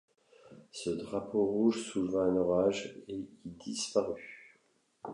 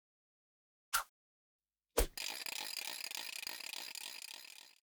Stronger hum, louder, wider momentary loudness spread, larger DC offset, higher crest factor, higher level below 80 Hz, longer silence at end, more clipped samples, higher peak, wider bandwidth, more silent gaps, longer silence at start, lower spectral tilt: neither; first, -33 LUFS vs -41 LUFS; first, 17 LU vs 12 LU; neither; second, 18 dB vs 26 dB; second, -66 dBFS vs -52 dBFS; second, 0 s vs 0.2 s; neither; about the same, -16 dBFS vs -18 dBFS; second, 11 kHz vs over 20 kHz; second, none vs 1.09-1.59 s; second, 0.45 s vs 0.9 s; first, -5 dB/octave vs -1 dB/octave